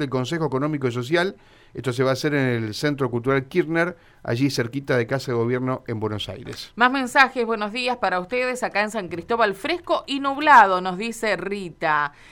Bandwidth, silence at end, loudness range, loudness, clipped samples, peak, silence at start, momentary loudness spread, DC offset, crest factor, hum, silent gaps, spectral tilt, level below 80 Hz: 17.5 kHz; 0.2 s; 4 LU; -22 LUFS; under 0.1%; -2 dBFS; 0 s; 10 LU; under 0.1%; 20 dB; none; none; -5.5 dB/octave; -54 dBFS